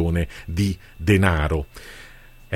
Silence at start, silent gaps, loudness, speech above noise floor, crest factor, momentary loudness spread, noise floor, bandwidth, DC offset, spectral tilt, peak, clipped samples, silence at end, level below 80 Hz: 0 s; none; -22 LUFS; 23 dB; 20 dB; 22 LU; -45 dBFS; 15.5 kHz; under 0.1%; -6.5 dB/octave; -2 dBFS; under 0.1%; 0 s; -32 dBFS